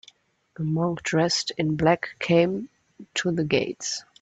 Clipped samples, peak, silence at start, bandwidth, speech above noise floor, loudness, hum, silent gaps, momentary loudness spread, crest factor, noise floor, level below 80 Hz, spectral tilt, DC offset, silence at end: under 0.1%; -6 dBFS; 0.6 s; 9 kHz; 33 dB; -25 LUFS; none; none; 10 LU; 18 dB; -57 dBFS; -58 dBFS; -5 dB/octave; under 0.1%; 0.2 s